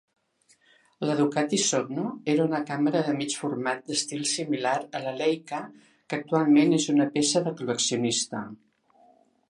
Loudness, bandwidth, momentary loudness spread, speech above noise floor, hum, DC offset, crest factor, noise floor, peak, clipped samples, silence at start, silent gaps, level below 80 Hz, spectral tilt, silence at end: -26 LUFS; 11.5 kHz; 11 LU; 39 dB; none; under 0.1%; 18 dB; -65 dBFS; -10 dBFS; under 0.1%; 1 s; none; -76 dBFS; -4 dB/octave; 0.95 s